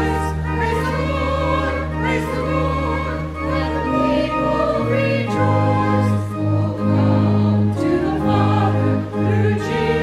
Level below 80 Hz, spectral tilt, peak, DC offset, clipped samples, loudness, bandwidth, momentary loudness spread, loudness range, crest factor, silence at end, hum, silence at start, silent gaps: -32 dBFS; -8 dB/octave; -4 dBFS; under 0.1%; under 0.1%; -19 LUFS; 12 kHz; 5 LU; 3 LU; 14 dB; 0 s; none; 0 s; none